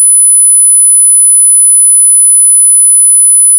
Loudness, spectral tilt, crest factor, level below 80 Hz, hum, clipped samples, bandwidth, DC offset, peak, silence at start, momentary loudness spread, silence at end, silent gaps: 0 LUFS; 11.5 dB/octave; 4 dB; under -90 dBFS; none; 6%; 11 kHz; under 0.1%; 0 dBFS; 0 s; 0 LU; 0 s; none